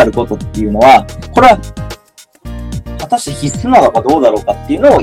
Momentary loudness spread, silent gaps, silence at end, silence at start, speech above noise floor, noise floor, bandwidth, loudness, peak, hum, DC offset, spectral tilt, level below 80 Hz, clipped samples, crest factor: 19 LU; none; 0 s; 0 s; 33 dB; -43 dBFS; 16.5 kHz; -10 LUFS; 0 dBFS; none; under 0.1%; -5.5 dB/octave; -30 dBFS; 2%; 10 dB